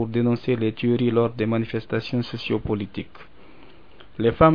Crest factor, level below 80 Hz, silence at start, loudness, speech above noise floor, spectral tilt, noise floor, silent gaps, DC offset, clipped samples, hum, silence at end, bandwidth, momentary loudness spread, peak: 22 dB; -44 dBFS; 0 s; -24 LUFS; 28 dB; -9 dB/octave; -50 dBFS; none; 0.7%; under 0.1%; none; 0 s; 5.4 kHz; 11 LU; 0 dBFS